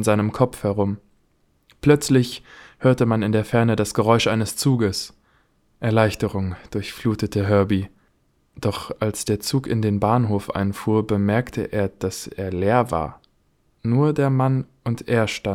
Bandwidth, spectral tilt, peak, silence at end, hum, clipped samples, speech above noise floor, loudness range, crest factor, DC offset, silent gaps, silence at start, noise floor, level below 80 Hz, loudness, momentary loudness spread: 16.5 kHz; -6 dB/octave; -2 dBFS; 0 s; none; under 0.1%; 43 dB; 4 LU; 20 dB; under 0.1%; none; 0 s; -63 dBFS; -50 dBFS; -21 LUFS; 10 LU